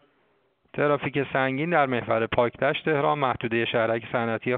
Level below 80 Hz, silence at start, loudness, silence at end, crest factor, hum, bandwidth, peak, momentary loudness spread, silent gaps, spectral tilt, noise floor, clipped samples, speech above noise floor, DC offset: -58 dBFS; 0.75 s; -25 LUFS; 0 s; 18 dB; none; 4.6 kHz; -6 dBFS; 3 LU; none; -4 dB/octave; -67 dBFS; under 0.1%; 43 dB; under 0.1%